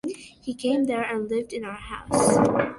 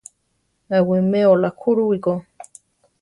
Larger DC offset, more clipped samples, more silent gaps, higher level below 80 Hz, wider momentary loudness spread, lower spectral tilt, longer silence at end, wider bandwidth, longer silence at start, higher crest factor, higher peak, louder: neither; neither; neither; first, -52 dBFS vs -62 dBFS; first, 16 LU vs 7 LU; second, -5 dB/octave vs -8 dB/octave; second, 0 s vs 0.6 s; about the same, 12 kHz vs 11.5 kHz; second, 0.05 s vs 0.7 s; about the same, 20 dB vs 16 dB; about the same, -4 dBFS vs -4 dBFS; second, -24 LUFS vs -18 LUFS